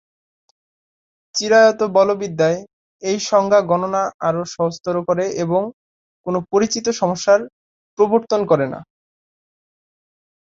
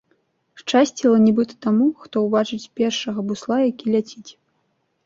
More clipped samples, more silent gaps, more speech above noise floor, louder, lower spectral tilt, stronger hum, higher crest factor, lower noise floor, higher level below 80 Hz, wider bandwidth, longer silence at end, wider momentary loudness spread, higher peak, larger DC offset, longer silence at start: neither; first, 2.73-2.99 s, 4.14-4.19 s, 5.73-6.24 s, 7.53-7.97 s vs none; first, over 73 dB vs 50 dB; about the same, -18 LUFS vs -20 LUFS; about the same, -4.5 dB/octave vs -5.5 dB/octave; neither; about the same, 18 dB vs 18 dB; first, under -90 dBFS vs -69 dBFS; about the same, -62 dBFS vs -64 dBFS; about the same, 7.8 kHz vs 7.6 kHz; first, 1.7 s vs 0.75 s; about the same, 11 LU vs 10 LU; about the same, -2 dBFS vs -4 dBFS; neither; first, 1.35 s vs 0.65 s